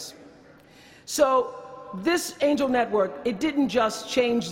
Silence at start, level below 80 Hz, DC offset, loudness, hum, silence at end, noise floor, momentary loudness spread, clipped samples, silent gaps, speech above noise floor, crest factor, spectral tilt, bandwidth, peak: 0 s; -60 dBFS; under 0.1%; -24 LUFS; none; 0 s; -51 dBFS; 15 LU; under 0.1%; none; 28 dB; 18 dB; -3.5 dB/octave; 16 kHz; -8 dBFS